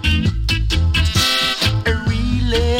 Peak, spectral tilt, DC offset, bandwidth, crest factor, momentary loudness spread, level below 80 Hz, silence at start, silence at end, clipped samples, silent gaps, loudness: -4 dBFS; -4.5 dB/octave; under 0.1%; 16.5 kHz; 14 dB; 5 LU; -22 dBFS; 0 s; 0 s; under 0.1%; none; -17 LUFS